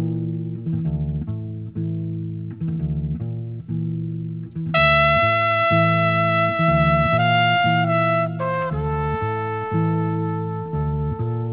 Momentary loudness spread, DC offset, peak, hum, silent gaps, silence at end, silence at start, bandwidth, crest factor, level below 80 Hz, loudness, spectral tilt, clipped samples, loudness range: 12 LU; 0.1%; -4 dBFS; none; none; 0 s; 0 s; 4 kHz; 16 dB; -38 dBFS; -21 LUFS; -10 dB/octave; under 0.1%; 10 LU